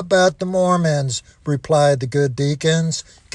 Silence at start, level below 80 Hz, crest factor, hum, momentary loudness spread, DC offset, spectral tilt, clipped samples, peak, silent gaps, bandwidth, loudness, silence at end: 0 s; -52 dBFS; 14 dB; none; 9 LU; under 0.1%; -5 dB/octave; under 0.1%; -2 dBFS; none; 11 kHz; -18 LUFS; 0.35 s